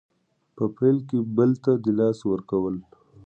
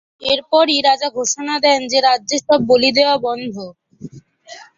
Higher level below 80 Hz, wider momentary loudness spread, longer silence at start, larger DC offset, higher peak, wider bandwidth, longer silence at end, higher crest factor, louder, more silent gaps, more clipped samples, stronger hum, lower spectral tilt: about the same, -60 dBFS vs -58 dBFS; second, 8 LU vs 11 LU; first, 0.55 s vs 0.2 s; neither; second, -8 dBFS vs 0 dBFS; about the same, 8.4 kHz vs 7.8 kHz; first, 0.45 s vs 0.15 s; about the same, 16 dB vs 16 dB; second, -24 LUFS vs -15 LUFS; neither; neither; neither; first, -10 dB/octave vs -2 dB/octave